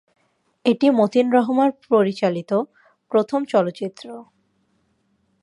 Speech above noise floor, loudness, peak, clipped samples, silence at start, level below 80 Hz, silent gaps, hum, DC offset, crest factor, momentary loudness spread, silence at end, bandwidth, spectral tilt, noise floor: 47 dB; -20 LUFS; -4 dBFS; under 0.1%; 0.65 s; -74 dBFS; none; none; under 0.1%; 18 dB; 15 LU; 1.2 s; 11 kHz; -7 dB/octave; -66 dBFS